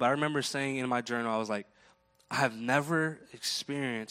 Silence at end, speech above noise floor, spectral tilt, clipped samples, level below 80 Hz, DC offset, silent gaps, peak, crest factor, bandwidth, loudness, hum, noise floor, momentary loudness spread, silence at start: 0.05 s; 33 dB; -4 dB/octave; under 0.1%; -78 dBFS; under 0.1%; none; -10 dBFS; 22 dB; 16 kHz; -32 LUFS; none; -65 dBFS; 8 LU; 0 s